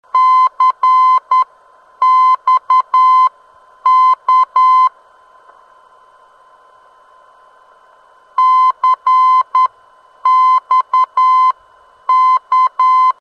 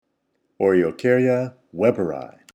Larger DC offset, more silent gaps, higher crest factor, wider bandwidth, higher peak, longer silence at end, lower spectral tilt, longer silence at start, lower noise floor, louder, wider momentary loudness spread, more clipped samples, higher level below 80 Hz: neither; neither; second, 10 dB vs 18 dB; second, 6.6 kHz vs 9.2 kHz; about the same, -4 dBFS vs -4 dBFS; second, 0.1 s vs 0.25 s; second, 1 dB/octave vs -8 dB/octave; second, 0.15 s vs 0.6 s; second, -47 dBFS vs -71 dBFS; first, -11 LUFS vs -20 LUFS; second, 6 LU vs 10 LU; neither; second, -72 dBFS vs -62 dBFS